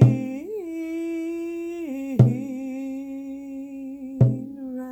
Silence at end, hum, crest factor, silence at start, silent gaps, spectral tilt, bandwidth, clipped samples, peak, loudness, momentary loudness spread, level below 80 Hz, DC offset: 0 s; none; 22 dB; 0 s; none; -10 dB/octave; 8.4 kHz; under 0.1%; -2 dBFS; -26 LUFS; 15 LU; -56 dBFS; under 0.1%